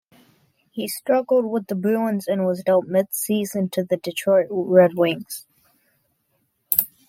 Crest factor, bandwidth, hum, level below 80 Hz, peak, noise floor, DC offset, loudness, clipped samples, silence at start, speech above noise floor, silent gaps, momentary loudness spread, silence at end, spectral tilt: 22 dB; 16.5 kHz; none; -70 dBFS; 0 dBFS; -69 dBFS; under 0.1%; -21 LUFS; under 0.1%; 0.75 s; 49 dB; none; 11 LU; 0.2 s; -5.5 dB/octave